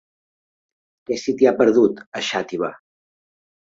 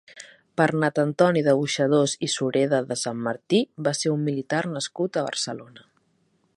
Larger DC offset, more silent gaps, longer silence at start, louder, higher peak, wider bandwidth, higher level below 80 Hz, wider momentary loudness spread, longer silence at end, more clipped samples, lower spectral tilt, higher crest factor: neither; first, 2.06-2.12 s vs none; first, 1.1 s vs 0.15 s; first, -20 LUFS vs -24 LUFS; about the same, -2 dBFS vs -4 dBFS; second, 7.8 kHz vs 11.5 kHz; first, -64 dBFS vs -70 dBFS; first, 12 LU vs 9 LU; first, 1.05 s vs 0.8 s; neither; about the same, -4.5 dB/octave vs -4.5 dB/octave; about the same, 20 dB vs 20 dB